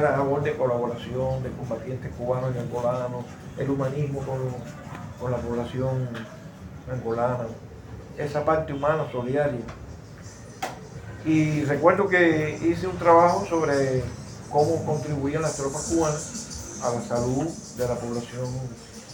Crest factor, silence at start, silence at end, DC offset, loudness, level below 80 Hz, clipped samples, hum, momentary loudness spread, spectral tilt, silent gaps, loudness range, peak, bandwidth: 22 dB; 0 s; 0 s; under 0.1%; -26 LUFS; -50 dBFS; under 0.1%; none; 18 LU; -6 dB/octave; none; 9 LU; -4 dBFS; 17 kHz